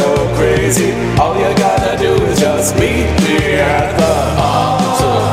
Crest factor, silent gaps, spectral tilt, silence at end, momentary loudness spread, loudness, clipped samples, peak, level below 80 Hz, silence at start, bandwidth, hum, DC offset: 12 dB; none; -5 dB/octave; 0 s; 1 LU; -12 LUFS; under 0.1%; 0 dBFS; -26 dBFS; 0 s; 16.5 kHz; none; 0.3%